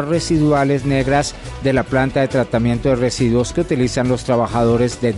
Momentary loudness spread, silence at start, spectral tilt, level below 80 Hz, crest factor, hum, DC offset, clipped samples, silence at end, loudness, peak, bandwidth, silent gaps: 3 LU; 0 s; -6 dB/octave; -34 dBFS; 12 dB; none; under 0.1%; under 0.1%; 0 s; -17 LUFS; -4 dBFS; 11.5 kHz; none